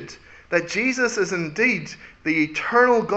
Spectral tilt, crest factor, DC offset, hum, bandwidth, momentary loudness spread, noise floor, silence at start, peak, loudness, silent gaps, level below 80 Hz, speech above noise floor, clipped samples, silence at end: -4.5 dB/octave; 18 dB; under 0.1%; none; 8.2 kHz; 11 LU; -42 dBFS; 0 s; -4 dBFS; -21 LUFS; none; -58 dBFS; 21 dB; under 0.1%; 0 s